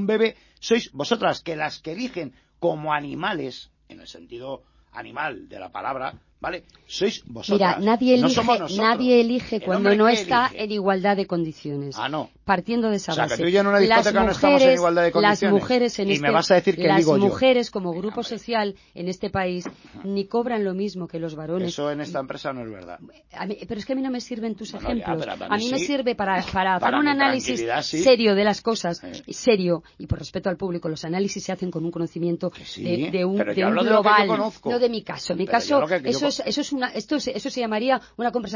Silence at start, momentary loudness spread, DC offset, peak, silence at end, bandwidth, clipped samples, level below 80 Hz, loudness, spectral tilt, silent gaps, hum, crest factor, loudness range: 0 s; 14 LU; under 0.1%; -2 dBFS; 0 s; 7.4 kHz; under 0.1%; -52 dBFS; -22 LUFS; -5 dB/octave; none; none; 20 dB; 11 LU